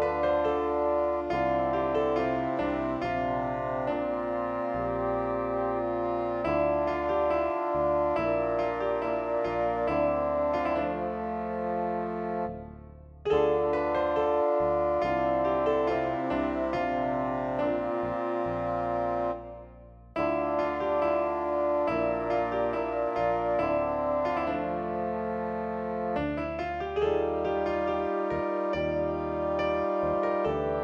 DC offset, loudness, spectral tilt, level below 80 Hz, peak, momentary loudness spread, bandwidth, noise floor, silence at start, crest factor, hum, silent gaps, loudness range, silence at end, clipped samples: under 0.1%; -29 LUFS; -8 dB/octave; -50 dBFS; -14 dBFS; 5 LU; 7 kHz; -49 dBFS; 0 s; 14 dB; none; none; 3 LU; 0 s; under 0.1%